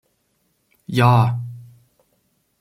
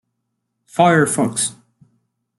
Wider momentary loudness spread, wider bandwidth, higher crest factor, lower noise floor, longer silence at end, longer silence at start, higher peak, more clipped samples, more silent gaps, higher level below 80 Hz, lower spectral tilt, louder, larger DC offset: first, 26 LU vs 9 LU; about the same, 12.5 kHz vs 12 kHz; about the same, 20 dB vs 18 dB; second, -67 dBFS vs -74 dBFS; first, 1 s vs 0.85 s; first, 0.9 s vs 0.75 s; about the same, -2 dBFS vs -2 dBFS; neither; neither; first, -56 dBFS vs -62 dBFS; first, -7.5 dB/octave vs -4.5 dB/octave; about the same, -18 LUFS vs -17 LUFS; neither